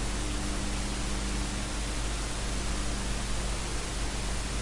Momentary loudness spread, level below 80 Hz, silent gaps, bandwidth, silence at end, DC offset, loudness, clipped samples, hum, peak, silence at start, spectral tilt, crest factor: 1 LU; -34 dBFS; none; 11.5 kHz; 0 s; under 0.1%; -33 LUFS; under 0.1%; none; -20 dBFS; 0 s; -3.5 dB/octave; 12 dB